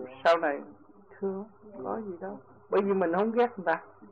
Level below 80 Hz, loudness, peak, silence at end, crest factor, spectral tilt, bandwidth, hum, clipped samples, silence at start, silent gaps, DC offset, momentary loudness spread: -76 dBFS; -29 LUFS; -12 dBFS; 0.05 s; 18 dB; -7 dB/octave; 8 kHz; none; under 0.1%; 0 s; none; under 0.1%; 16 LU